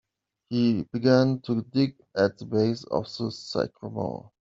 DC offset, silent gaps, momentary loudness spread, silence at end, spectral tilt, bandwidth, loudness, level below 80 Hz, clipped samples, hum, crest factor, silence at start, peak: under 0.1%; none; 11 LU; 0.15 s; -7 dB/octave; 7.6 kHz; -26 LUFS; -64 dBFS; under 0.1%; none; 20 dB; 0.5 s; -6 dBFS